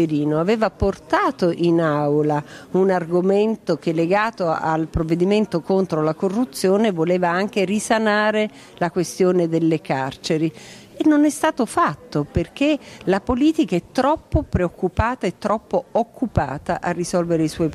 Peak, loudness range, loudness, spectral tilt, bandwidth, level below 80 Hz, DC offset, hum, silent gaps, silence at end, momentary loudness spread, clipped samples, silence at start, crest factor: -4 dBFS; 2 LU; -20 LUFS; -6 dB/octave; 14 kHz; -40 dBFS; under 0.1%; none; none; 0 s; 6 LU; under 0.1%; 0 s; 16 dB